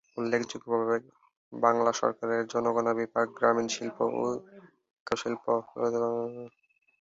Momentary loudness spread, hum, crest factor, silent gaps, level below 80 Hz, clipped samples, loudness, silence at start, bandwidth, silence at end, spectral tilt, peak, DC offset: 9 LU; none; 22 dB; 1.37-1.51 s, 4.90-5.06 s; -72 dBFS; under 0.1%; -29 LUFS; 0.15 s; 7.8 kHz; 0.55 s; -4.5 dB/octave; -8 dBFS; under 0.1%